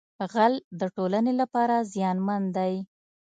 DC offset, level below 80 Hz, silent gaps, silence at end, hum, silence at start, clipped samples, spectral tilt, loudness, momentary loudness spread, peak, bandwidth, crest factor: under 0.1%; -76 dBFS; 0.64-0.71 s; 0.5 s; none; 0.2 s; under 0.1%; -7 dB/octave; -26 LUFS; 8 LU; -8 dBFS; 9 kHz; 18 dB